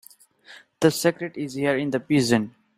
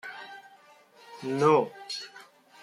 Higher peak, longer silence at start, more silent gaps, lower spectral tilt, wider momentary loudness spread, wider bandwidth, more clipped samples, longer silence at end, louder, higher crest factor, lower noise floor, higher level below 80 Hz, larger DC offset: first, -4 dBFS vs -8 dBFS; first, 0.5 s vs 0.05 s; neither; about the same, -5 dB/octave vs -5.5 dB/octave; second, 7 LU vs 24 LU; first, 16 kHz vs 13 kHz; neither; about the same, 0.3 s vs 0.4 s; first, -23 LUFS vs -27 LUFS; about the same, 20 dB vs 22 dB; second, -51 dBFS vs -57 dBFS; first, -62 dBFS vs -78 dBFS; neither